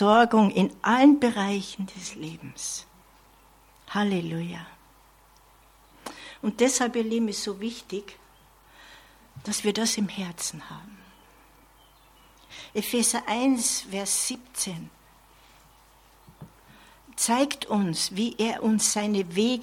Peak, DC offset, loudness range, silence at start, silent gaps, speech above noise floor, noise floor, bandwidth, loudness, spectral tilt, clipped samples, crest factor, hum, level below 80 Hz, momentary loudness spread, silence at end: -6 dBFS; under 0.1%; 8 LU; 0 s; none; 32 dB; -57 dBFS; 16.5 kHz; -25 LUFS; -3.5 dB/octave; under 0.1%; 22 dB; none; -62 dBFS; 20 LU; 0 s